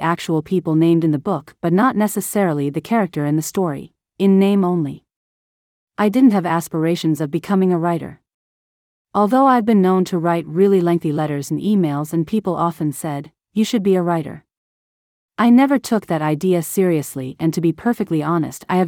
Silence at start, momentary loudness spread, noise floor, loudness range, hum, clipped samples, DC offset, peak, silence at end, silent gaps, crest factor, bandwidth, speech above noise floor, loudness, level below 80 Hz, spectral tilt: 0 s; 9 LU; under -90 dBFS; 3 LU; none; under 0.1%; under 0.1%; -4 dBFS; 0 s; 5.16-5.87 s, 8.34-9.05 s, 14.57-15.29 s; 14 dB; 17.5 kHz; over 73 dB; -18 LUFS; -60 dBFS; -6.5 dB/octave